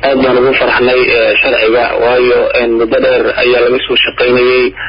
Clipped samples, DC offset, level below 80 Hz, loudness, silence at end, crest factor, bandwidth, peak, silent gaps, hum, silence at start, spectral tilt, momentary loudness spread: under 0.1%; under 0.1%; -36 dBFS; -9 LUFS; 0 s; 8 dB; 5.4 kHz; 0 dBFS; none; none; 0 s; -9.5 dB/octave; 2 LU